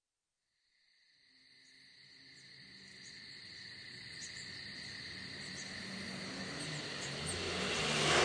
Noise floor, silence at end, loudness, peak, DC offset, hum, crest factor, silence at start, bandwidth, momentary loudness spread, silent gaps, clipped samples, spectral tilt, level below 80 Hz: under -90 dBFS; 0 s; -40 LUFS; -18 dBFS; under 0.1%; none; 26 dB; 1.45 s; 10.5 kHz; 21 LU; none; under 0.1%; -2.5 dB/octave; -66 dBFS